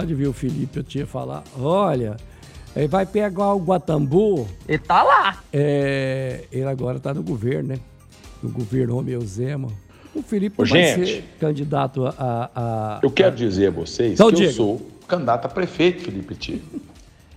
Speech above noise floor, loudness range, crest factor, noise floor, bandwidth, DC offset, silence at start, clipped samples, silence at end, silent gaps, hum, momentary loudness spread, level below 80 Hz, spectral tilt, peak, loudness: 23 dB; 7 LU; 20 dB; -44 dBFS; 15 kHz; under 0.1%; 0 s; under 0.1%; 0 s; none; none; 14 LU; -46 dBFS; -6 dB/octave; 0 dBFS; -21 LUFS